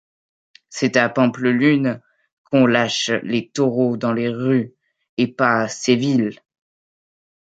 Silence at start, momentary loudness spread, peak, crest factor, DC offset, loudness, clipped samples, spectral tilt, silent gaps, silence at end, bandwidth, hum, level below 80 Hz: 0.7 s; 8 LU; -2 dBFS; 18 dB; under 0.1%; -19 LUFS; under 0.1%; -5 dB/octave; 2.32-2.45 s, 5.09-5.17 s; 1.25 s; 8.8 kHz; none; -66 dBFS